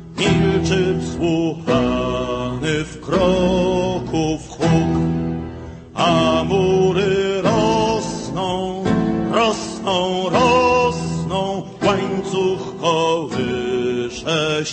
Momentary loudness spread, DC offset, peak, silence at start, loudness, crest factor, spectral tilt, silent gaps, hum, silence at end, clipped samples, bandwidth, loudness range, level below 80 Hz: 7 LU; under 0.1%; -2 dBFS; 0 s; -19 LUFS; 16 dB; -5.5 dB/octave; none; none; 0 s; under 0.1%; 8.8 kHz; 2 LU; -38 dBFS